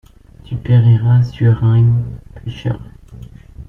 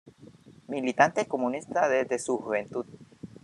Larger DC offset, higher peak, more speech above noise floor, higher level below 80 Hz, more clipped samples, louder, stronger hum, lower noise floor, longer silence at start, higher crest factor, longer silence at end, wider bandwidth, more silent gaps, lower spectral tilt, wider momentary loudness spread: neither; about the same, -2 dBFS vs -4 dBFS; about the same, 23 dB vs 25 dB; first, -38 dBFS vs -74 dBFS; neither; first, -14 LUFS vs -28 LUFS; neither; second, -35 dBFS vs -52 dBFS; first, 0.5 s vs 0.05 s; second, 12 dB vs 24 dB; about the same, 0.05 s vs 0.05 s; second, 5.6 kHz vs 12 kHz; neither; first, -9.5 dB/octave vs -4.5 dB/octave; about the same, 17 LU vs 16 LU